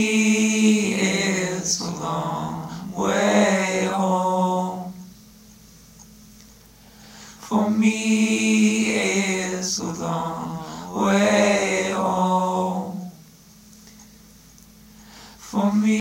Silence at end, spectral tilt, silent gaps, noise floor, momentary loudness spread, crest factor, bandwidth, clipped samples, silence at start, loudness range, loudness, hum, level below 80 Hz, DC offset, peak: 0 s; -4.5 dB/octave; none; -49 dBFS; 14 LU; 16 dB; 16 kHz; under 0.1%; 0 s; 8 LU; -21 LUFS; none; -58 dBFS; under 0.1%; -6 dBFS